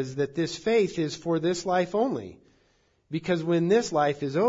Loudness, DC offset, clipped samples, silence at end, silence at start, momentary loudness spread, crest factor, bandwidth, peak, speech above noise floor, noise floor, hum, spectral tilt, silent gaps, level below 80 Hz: -26 LUFS; under 0.1%; under 0.1%; 0 s; 0 s; 9 LU; 16 dB; 7.8 kHz; -12 dBFS; 41 dB; -67 dBFS; none; -5.5 dB/octave; none; -62 dBFS